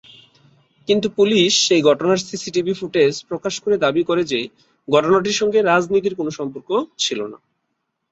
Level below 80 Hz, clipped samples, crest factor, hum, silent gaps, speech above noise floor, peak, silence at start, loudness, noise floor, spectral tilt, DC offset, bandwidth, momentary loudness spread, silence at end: -60 dBFS; under 0.1%; 16 dB; none; none; 56 dB; -2 dBFS; 0.9 s; -18 LUFS; -74 dBFS; -3.5 dB/octave; under 0.1%; 8 kHz; 11 LU; 0.75 s